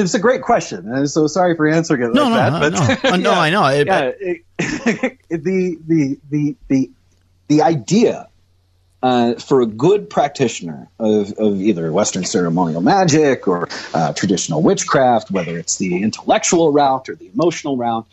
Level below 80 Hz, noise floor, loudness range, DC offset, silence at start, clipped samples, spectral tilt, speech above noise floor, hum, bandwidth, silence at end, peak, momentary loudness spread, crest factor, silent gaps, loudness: -52 dBFS; -56 dBFS; 3 LU; under 0.1%; 0 s; under 0.1%; -5 dB/octave; 41 dB; none; 11.5 kHz; 0.1 s; -4 dBFS; 8 LU; 12 dB; none; -16 LUFS